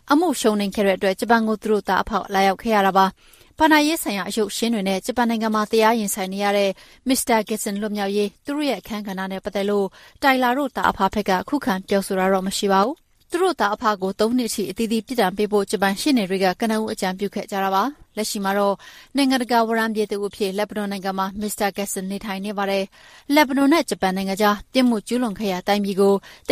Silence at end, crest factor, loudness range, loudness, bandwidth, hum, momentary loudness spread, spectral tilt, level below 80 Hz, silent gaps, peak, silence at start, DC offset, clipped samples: 0 s; 18 dB; 3 LU; -21 LUFS; 15.5 kHz; none; 8 LU; -4.5 dB/octave; -52 dBFS; none; -2 dBFS; 0.05 s; under 0.1%; under 0.1%